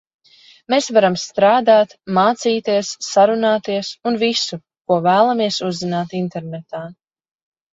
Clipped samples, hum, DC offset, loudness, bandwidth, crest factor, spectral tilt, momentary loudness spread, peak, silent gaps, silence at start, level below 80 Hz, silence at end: under 0.1%; none; under 0.1%; -17 LUFS; 8 kHz; 18 dB; -4.5 dB/octave; 14 LU; 0 dBFS; 4.81-4.85 s; 0.7 s; -64 dBFS; 0.8 s